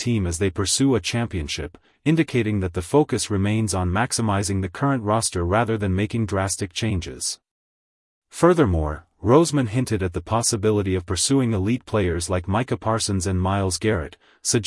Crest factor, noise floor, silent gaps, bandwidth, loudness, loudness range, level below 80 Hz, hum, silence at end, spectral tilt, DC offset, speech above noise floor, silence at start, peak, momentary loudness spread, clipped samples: 18 dB; under -90 dBFS; 7.51-8.22 s; 12 kHz; -22 LUFS; 3 LU; -44 dBFS; none; 0 s; -5 dB/octave; under 0.1%; over 68 dB; 0 s; -4 dBFS; 8 LU; under 0.1%